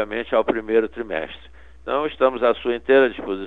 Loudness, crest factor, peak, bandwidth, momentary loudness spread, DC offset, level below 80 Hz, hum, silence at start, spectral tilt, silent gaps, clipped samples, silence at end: -21 LUFS; 18 dB; -4 dBFS; 4.3 kHz; 12 LU; 0.5%; -50 dBFS; none; 0 s; -7 dB/octave; none; under 0.1%; 0 s